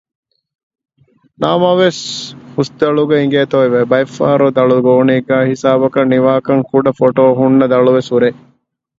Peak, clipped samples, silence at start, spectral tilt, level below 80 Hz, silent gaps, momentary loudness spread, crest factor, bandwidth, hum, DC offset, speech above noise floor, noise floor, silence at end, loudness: 0 dBFS; under 0.1%; 1.4 s; -6.5 dB/octave; -54 dBFS; none; 6 LU; 12 dB; 7.8 kHz; none; under 0.1%; 45 dB; -56 dBFS; 0.65 s; -12 LUFS